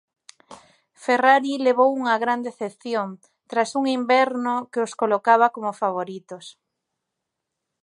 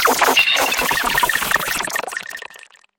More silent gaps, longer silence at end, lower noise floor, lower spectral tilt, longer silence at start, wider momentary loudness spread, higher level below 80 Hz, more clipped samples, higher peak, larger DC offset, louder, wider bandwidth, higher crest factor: neither; first, 1.3 s vs 0.4 s; first, -82 dBFS vs -44 dBFS; first, -4 dB/octave vs -0.5 dB/octave; first, 0.5 s vs 0 s; about the same, 15 LU vs 17 LU; second, -80 dBFS vs -46 dBFS; neither; about the same, -2 dBFS vs 0 dBFS; neither; second, -21 LUFS vs -16 LUFS; second, 11 kHz vs 17 kHz; about the same, 20 dB vs 18 dB